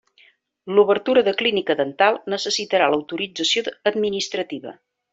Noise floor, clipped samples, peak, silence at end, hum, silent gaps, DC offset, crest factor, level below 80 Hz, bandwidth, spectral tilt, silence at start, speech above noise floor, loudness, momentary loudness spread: -57 dBFS; under 0.1%; -2 dBFS; 0.4 s; none; none; under 0.1%; 18 dB; -66 dBFS; 7.8 kHz; -3 dB/octave; 0.65 s; 36 dB; -20 LUFS; 10 LU